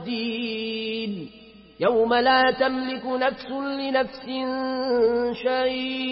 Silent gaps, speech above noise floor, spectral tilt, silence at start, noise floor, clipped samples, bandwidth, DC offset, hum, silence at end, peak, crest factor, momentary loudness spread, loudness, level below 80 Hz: none; 25 dB; -9 dB/octave; 0 s; -48 dBFS; under 0.1%; 5.8 kHz; under 0.1%; none; 0 s; -8 dBFS; 16 dB; 11 LU; -24 LUFS; -58 dBFS